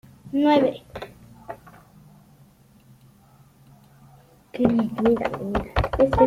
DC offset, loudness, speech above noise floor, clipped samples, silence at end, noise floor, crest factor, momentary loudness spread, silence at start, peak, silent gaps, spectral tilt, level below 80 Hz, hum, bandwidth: under 0.1%; -22 LUFS; 34 dB; under 0.1%; 0 s; -54 dBFS; 22 dB; 22 LU; 0.25 s; -2 dBFS; none; -8 dB/octave; -40 dBFS; none; 15.5 kHz